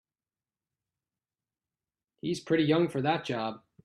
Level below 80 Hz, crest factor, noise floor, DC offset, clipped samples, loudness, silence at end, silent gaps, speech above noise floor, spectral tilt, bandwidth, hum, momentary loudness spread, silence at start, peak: -72 dBFS; 20 dB; under -90 dBFS; under 0.1%; under 0.1%; -29 LUFS; 0.25 s; none; over 62 dB; -6.5 dB/octave; 12 kHz; none; 11 LU; 2.25 s; -14 dBFS